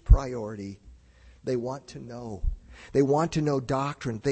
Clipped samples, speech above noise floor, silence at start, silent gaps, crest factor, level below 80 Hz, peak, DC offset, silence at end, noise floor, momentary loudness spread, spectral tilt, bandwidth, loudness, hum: under 0.1%; 26 dB; 0.05 s; none; 22 dB; -30 dBFS; -4 dBFS; under 0.1%; 0 s; -54 dBFS; 16 LU; -7 dB/octave; 8.6 kHz; -28 LUFS; none